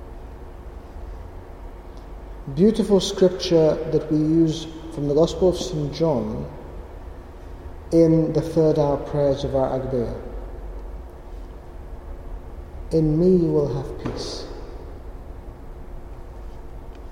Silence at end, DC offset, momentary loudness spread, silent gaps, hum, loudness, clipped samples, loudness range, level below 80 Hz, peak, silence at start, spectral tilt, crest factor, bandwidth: 0 s; under 0.1%; 23 LU; none; none; -21 LUFS; under 0.1%; 9 LU; -36 dBFS; -6 dBFS; 0 s; -7 dB/octave; 18 dB; 14 kHz